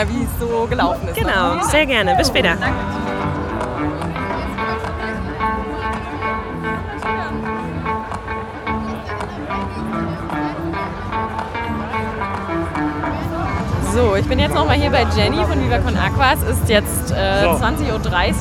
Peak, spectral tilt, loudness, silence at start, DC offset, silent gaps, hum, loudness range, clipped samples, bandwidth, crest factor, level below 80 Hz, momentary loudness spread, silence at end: 0 dBFS; -5 dB/octave; -19 LUFS; 0 s; under 0.1%; none; none; 8 LU; under 0.1%; 16.5 kHz; 18 dB; -30 dBFS; 9 LU; 0 s